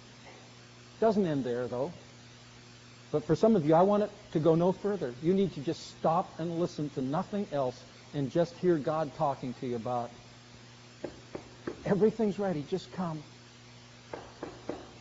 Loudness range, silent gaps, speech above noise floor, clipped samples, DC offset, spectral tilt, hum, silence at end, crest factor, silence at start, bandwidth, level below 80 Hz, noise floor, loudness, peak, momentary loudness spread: 6 LU; none; 23 dB; under 0.1%; under 0.1%; -7 dB/octave; none; 0 s; 18 dB; 0 s; 7.6 kHz; -64 dBFS; -53 dBFS; -31 LUFS; -12 dBFS; 25 LU